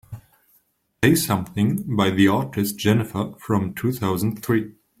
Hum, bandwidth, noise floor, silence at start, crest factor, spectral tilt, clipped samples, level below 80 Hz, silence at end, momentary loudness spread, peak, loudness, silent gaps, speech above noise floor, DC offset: none; 16.5 kHz; -64 dBFS; 0.1 s; 20 dB; -5.5 dB/octave; under 0.1%; -54 dBFS; 0.3 s; 9 LU; -2 dBFS; -22 LUFS; none; 43 dB; under 0.1%